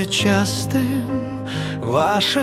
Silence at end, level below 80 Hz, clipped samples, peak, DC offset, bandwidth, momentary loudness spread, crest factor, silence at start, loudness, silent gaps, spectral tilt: 0 s; -50 dBFS; under 0.1%; -4 dBFS; under 0.1%; 16 kHz; 8 LU; 16 dB; 0 s; -20 LUFS; none; -4.5 dB/octave